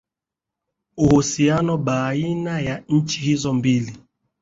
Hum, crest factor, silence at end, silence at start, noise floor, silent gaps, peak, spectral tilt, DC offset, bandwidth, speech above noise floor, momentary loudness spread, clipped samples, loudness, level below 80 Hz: none; 18 dB; 0.45 s; 0.95 s; -86 dBFS; none; -4 dBFS; -5.5 dB/octave; under 0.1%; 7.8 kHz; 67 dB; 8 LU; under 0.1%; -20 LUFS; -48 dBFS